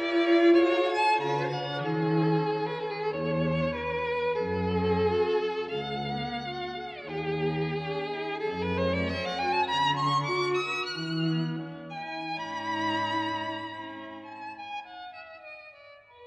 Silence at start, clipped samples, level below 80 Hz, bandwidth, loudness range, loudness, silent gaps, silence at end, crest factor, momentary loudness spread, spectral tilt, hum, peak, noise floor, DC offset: 0 s; under 0.1%; -62 dBFS; 10 kHz; 6 LU; -28 LUFS; none; 0 s; 18 dB; 14 LU; -6.5 dB/octave; none; -12 dBFS; -52 dBFS; under 0.1%